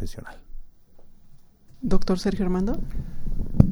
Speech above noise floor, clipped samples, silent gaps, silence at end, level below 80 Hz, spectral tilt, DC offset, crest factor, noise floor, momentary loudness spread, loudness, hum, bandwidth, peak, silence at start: 25 dB; under 0.1%; none; 0 s; -30 dBFS; -8 dB/octave; under 0.1%; 24 dB; -47 dBFS; 17 LU; -27 LUFS; none; 11 kHz; 0 dBFS; 0 s